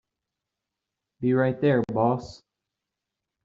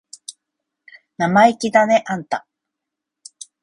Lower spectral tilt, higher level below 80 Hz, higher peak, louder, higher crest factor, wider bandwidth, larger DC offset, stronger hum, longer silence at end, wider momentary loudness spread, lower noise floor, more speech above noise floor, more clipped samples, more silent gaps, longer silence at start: first, -7 dB/octave vs -5 dB/octave; about the same, -62 dBFS vs -62 dBFS; second, -10 dBFS vs 0 dBFS; second, -24 LUFS vs -17 LUFS; about the same, 18 dB vs 20 dB; second, 7.6 kHz vs 11.5 kHz; neither; neither; second, 1.1 s vs 1.25 s; second, 9 LU vs 24 LU; about the same, -86 dBFS vs -83 dBFS; second, 62 dB vs 67 dB; neither; neither; first, 1.2 s vs 0.3 s